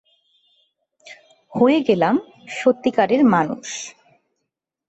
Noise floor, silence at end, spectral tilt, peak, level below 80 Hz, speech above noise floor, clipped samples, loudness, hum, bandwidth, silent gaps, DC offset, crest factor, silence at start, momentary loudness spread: -79 dBFS; 1 s; -5.5 dB/octave; -4 dBFS; -64 dBFS; 62 dB; under 0.1%; -18 LUFS; none; 8.2 kHz; none; under 0.1%; 18 dB; 1.05 s; 15 LU